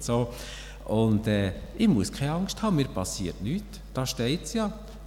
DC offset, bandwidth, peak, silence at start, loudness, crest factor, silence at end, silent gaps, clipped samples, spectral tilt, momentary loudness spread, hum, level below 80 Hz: under 0.1%; 16.5 kHz; -12 dBFS; 0 s; -28 LUFS; 16 dB; 0 s; none; under 0.1%; -5.5 dB/octave; 10 LU; none; -42 dBFS